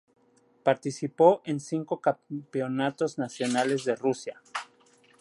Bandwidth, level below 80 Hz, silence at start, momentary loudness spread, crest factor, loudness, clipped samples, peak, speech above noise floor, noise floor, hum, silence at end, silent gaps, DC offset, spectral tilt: 11.5 kHz; -80 dBFS; 0.65 s; 14 LU; 22 dB; -28 LUFS; under 0.1%; -6 dBFS; 34 dB; -61 dBFS; none; 0.55 s; none; under 0.1%; -5.5 dB/octave